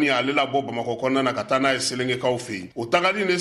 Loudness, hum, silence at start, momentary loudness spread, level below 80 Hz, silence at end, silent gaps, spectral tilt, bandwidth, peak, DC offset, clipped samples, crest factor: -23 LUFS; none; 0 s; 8 LU; -62 dBFS; 0 s; none; -4 dB/octave; 13 kHz; -8 dBFS; under 0.1%; under 0.1%; 16 dB